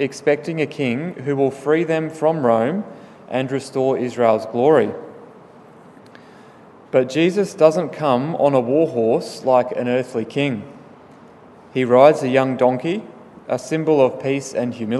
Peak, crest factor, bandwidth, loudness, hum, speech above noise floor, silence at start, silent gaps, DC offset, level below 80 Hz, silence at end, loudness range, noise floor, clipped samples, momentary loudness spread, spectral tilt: 0 dBFS; 20 dB; 12 kHz; -19 LUFS; none; 27 dB; 0 s; none; under 0.1%; -68 dBFS; 0 s; 3 LU; -45 dBFS; under 0.1%; 9 LU; -6.5 dB/octave